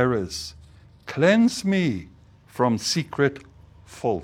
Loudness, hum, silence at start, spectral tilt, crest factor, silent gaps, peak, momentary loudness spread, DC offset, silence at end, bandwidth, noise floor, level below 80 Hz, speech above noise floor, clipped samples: -23 LUFS; none; 0 s; -5 dB/octave; 18 dB; none; -6 dBFS; 18 LU; under 0.1%; 0 s; 15.5 kHz; -49 dBFS; -52 dBFS; 27 dB; under 0.1%